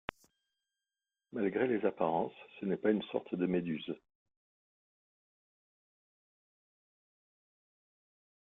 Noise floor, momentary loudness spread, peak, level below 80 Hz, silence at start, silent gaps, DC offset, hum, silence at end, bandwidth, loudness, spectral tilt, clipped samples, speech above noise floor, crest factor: under -90 dBFS; 12 LU; -14 dBFS; -74 dBFS; 1.35 s; none; under 0.1%; none; 4.5 s; 7.4 kHz; -35 LUFS; -8.5 dB/octave; under 0.1%; over 56 dB; 26 dB